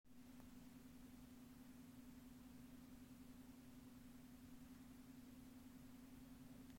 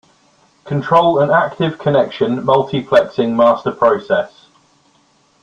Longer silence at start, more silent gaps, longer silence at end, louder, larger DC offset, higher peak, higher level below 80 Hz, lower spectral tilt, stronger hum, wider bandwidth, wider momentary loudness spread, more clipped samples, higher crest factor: second, 0.05 s vs 0.65 s; neither; second, 0 s vs 1.15 s; second, -62 LUFS vs -15 LUFS; neither; second, -46 dBFS vs 0 dBFS; second, -72 dBFS vs -56 dBFS; second, -5 dB/octave vs -7.5 dB/octave; neither; first, 16.5 kHz vs 7.6 kHz; second, 1 LU vs 6 LU; neither; about the same, 16 dB vs 14 dB